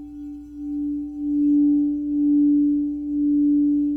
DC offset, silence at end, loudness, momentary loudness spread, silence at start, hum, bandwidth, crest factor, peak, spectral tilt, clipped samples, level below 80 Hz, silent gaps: under 0.1%; 0 s; -21 LUFS; 15 LU; 0 s; none; 0.8 kHz; 8 dB; -14 dBFS; -10.5 dB/octave; under 0.1%; -50 dBFS; none